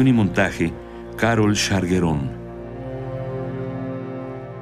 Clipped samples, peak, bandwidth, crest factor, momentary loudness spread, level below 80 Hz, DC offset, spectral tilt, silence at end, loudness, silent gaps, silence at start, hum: under 0.1%; -6 dBFS; 15 kHz; 16 dB; 15 LU; -42 dBFS; under 0.1%; -5.5 dB/octave; 0 s; -22 LUFS; none; 0 s; none